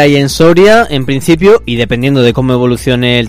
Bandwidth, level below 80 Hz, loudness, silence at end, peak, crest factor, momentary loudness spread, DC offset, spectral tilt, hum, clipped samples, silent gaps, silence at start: 16 kHz; -30 dBFS; -8 LUFS; 0 s; 0 dBFS; 8 dB; 6 LU; under 0.1%; -6 dB/octave; none; 3%; none; 0 s